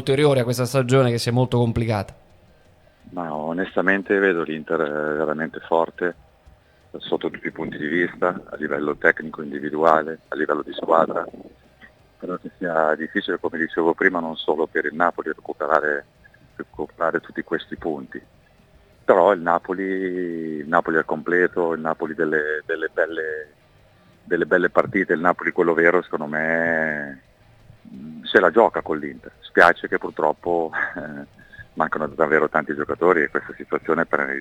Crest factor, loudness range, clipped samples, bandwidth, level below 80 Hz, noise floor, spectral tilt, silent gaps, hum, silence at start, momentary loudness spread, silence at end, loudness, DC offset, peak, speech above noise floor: 22 dB; 5 LU; under 0.1%; 18.5 kHz; -56 dBFS; -54 dBFS; -6 dB/octave; none; none; 0 s; 12 LU; 0 s; -21 LUFS; under 0.1%; 0 dBFS; 33 dB